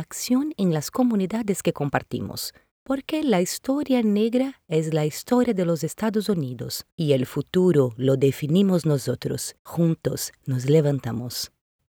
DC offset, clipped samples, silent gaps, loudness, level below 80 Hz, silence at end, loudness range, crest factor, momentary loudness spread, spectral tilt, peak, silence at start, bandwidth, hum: under 0.1%; under 0.1%; 2.71-2.86 s, 6.92-6.98 s, 9.59-9.65 s; -24 LUFS; -58 dBFS; 0.45 s; 3 LU; 18 dB; 10 LU; -6 dB/octave; -4 dBFS; 0 s; over 20 kHz; none